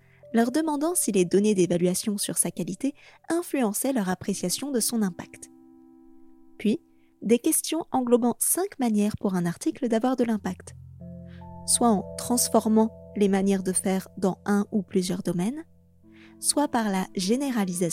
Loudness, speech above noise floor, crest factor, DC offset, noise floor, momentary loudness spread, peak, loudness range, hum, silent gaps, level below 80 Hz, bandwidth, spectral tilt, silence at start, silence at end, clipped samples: -25 LUFS; 29 dB; 18 dB; under 0.1%; -54 dBFS; 10 LU; -6 dBFS; 4 LU; none; none; -64 dBFS; 16.5 kHz; -4.5 dB/octave; 0.25 s; 0 s; under 0.1%